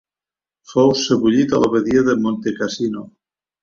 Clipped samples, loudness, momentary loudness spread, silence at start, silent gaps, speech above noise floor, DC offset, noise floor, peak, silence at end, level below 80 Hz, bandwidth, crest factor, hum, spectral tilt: under 0.1%; -17 LUFS; 8 LU; 0.7 s; none; over 74 dB; under 0.1%; under -90 dBFS; -2 dBFS; 0.55 s; -54 dBFS; 7.6 kHz; 16 dB; none; -5.5 dB/octave